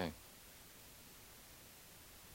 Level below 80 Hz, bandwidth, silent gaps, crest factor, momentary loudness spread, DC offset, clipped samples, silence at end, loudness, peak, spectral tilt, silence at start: -68 dBFS; 16 kHz; none; 28 dB; 1 LU; under 0.1%; under 0.1%; 0 s; -55 LUFS; -26 dBFS; -4 dB/octave; 0 s